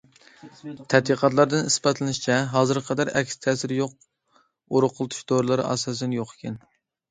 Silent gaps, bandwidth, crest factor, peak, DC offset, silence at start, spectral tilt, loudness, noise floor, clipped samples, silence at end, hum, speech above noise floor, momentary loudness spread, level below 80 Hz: none; 9.6 kHz; 22 dB; -2 dBFS; under 0.1%; 0.45 s; -4.5 dB/octave; -23 LUFS; -64 dBFS; under 0.1%; 0.55 s; none; 41 dB; 14 LU; -64 dBFS